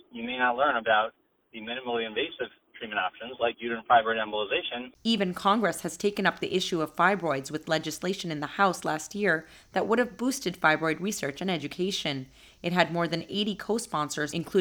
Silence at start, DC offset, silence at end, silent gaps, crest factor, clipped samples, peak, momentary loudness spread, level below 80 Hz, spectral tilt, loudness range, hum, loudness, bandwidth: 0.15 s; under 0.1%; 0 s; none; 24 dB; under 0.1%; -4 dBFS; 9 LU; -64 dBFS; -4 dB/octave; 2 LU; none; -28 LUFS; over 20 kHz